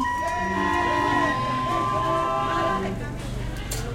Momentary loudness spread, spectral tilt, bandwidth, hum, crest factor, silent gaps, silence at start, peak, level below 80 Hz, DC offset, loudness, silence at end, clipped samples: 10 LU; -5 dB/octave; 16 kHz; none; 14 dB; none; 0 s; -12 dBFS; -38 dBFS; under 0.1%; -24 LUFS; 0 s; under 0.1%